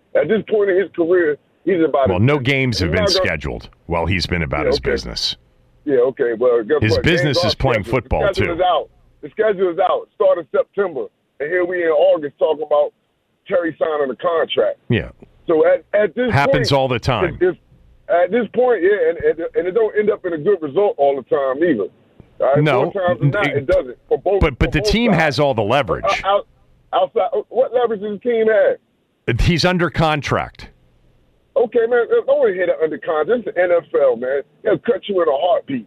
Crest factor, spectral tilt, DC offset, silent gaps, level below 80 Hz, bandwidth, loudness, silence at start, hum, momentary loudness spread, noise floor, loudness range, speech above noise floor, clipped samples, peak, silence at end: 12 dB; -6 dB/octave; under 0.1%; none; -36 dBFS; 14 kHz; -17 LUFS; 0.15 s; none; 7 LU; -65 dBFS; 2 LU; 48 dB; under 0.1%; -4 dBFS; 0.05 s